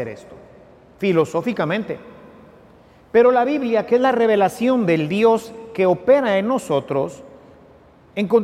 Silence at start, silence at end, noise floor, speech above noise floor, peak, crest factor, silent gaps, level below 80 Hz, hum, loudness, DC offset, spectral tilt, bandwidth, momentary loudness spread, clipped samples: 0 s; 0 s; -49 dBFS; 31 dB; -4 dBFS; 16 dB; none; -58 dBFS; none; -18 LUFS; under 0.1%; -6.5 dB/octave; 14.5 kHz; 13 LU; under 0.1%